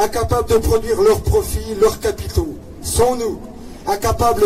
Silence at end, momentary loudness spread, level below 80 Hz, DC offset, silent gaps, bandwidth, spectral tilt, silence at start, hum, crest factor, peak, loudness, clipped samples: 0 s; 13 LU; -28 dBFS; under 0.1%; none; 16 kHz; -5 dB/octave; 0 s; none; 14 dB; -4 dBFS; -18 LUFS; under 0.1%